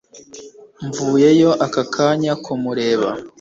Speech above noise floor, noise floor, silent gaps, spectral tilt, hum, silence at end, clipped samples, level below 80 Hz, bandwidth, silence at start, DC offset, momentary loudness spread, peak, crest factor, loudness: 23 dB; -39 dBFS; none; -5.5 dB/octave; none; 0.1 s; under 0.1%; -58 dBFS; 7.8 kHz; 0.15 s; under 0.1%; 13 LU; -2 dBFS; 16 dB; -17 LUFS